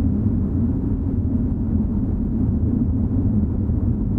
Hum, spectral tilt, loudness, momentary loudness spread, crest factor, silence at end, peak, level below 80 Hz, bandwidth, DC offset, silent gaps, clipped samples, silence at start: none; -13.5 dB/octave; -21 LUFS; 2 LU; 12 dB; 0 s; -8 dBFS; -26 dBFS; 2.1 kHz; under 0.1%; none; under 0.1%; 0 s